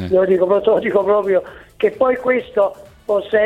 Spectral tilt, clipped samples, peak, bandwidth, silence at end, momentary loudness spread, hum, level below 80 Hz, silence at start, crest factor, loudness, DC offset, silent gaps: -7.5 dB/octave; under 0.1%; -2 dBFS; 9 kHz; 0 s; 6 LU; none; -50 dBFS; 0 s; 14 dB; -17 LUFS; under 0.1%; none